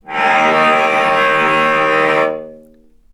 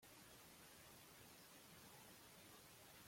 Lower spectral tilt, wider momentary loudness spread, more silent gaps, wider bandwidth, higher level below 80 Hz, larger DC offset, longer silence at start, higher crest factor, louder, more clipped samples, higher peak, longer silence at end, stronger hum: first, -4 dB/octave vs -2.5 dB/octave; first, 4 LU vs 1 LU; neither; second, 13.5 kHz vs 16.5 kHz; first, -54 dBFS vs -84 dBFS; neither; about the same, 0.05 s vs 0 s; about the same, 14 dB vs 16 dB; first, -12 LUFS vs -62 LUFS; neither; first, 0 dBFS vs -50 dBFS; first, 0.55 s vs 0 s; neither